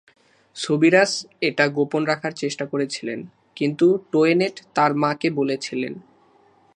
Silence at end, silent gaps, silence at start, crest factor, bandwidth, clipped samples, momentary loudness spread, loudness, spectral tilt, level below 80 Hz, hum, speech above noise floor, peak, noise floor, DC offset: 0.75 s; none; 0.55 s; 20 dB; 10.5 kHz; under 0.1%; 14 LU; -21 LUFS; -5 dB/octave; -74 dBFS; none; 36 dB; -2 dBFS; -57 dBFS; under 0.1%